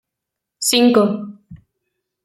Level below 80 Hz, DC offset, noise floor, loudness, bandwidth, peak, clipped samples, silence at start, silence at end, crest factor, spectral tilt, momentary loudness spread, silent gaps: -60 dBFS; under 0.1%; -82 dBFS; -15 LUFS; 16 kHz; -2 dBFS; under 0.1%; 0.6 s; 0.7 s; 18 dB; -3.5 dB/octave; 16 LU; none